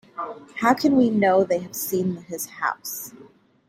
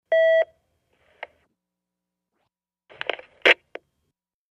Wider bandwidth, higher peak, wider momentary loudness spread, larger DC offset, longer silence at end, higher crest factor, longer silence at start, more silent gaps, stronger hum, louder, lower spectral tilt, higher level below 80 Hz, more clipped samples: first, 16 kHz vs 10 kHz; about the same, -4 dBFS vs -2 dBFS; second, 15 LU vs 24 LU; neither; second, 0.45 s vs 0.95 s; about the same, 20 dB vs 24 dB; about the same, 0.15 s vs 0.1 s; neither; neither; about the same, -22 LUFS vs -21 LUFS; first, -5 dB/octave vs -1.5 dB/octave; first, -64 dBFS vs -76 dBFS; neither